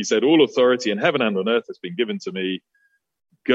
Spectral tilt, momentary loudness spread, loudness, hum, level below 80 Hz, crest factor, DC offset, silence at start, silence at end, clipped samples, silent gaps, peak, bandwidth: -4.5 dB/octave; 13 LU; -20 LUFS; none; -72 dBFS; 18 dB; under 0.1%; 0 s; 0 s; under 0.1%; none; -4 dBFS; 8 kHz